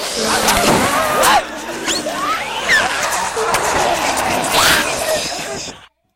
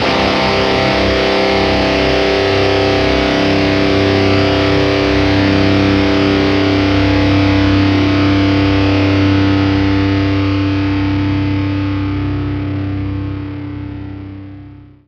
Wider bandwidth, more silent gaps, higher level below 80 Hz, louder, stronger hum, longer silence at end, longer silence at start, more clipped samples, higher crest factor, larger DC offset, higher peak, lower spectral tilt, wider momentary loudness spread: first, 16 kHz vs 8 kHz; neither; second, -40 dBFS vs -28 dBFS; about the same, -15 LUFS vs -13 LUFS; neither; about the same, 0.3 s vs 0.25 s; about the same, 0 s vs 0 s; neither; about the same, 16 dB vs 12 dB; first, 0.1% vs under 0.1%; about the same, 0 dBFS vs 0 dBFS; second, -1.5 dB/octave vs -6.5 dB/octave; about the same, 10 LU vs 9 LU